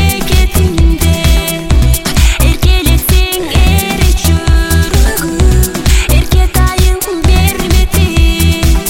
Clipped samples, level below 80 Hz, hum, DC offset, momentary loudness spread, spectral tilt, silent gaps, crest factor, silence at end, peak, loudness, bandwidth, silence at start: 0.3%; -10 dBFS; none; under 0.1%; 2 LU; -4.5 dB/octave; none; 8 dB; 0 s; 0 dBFS; -10 LUFS; 17 kHz; 0 s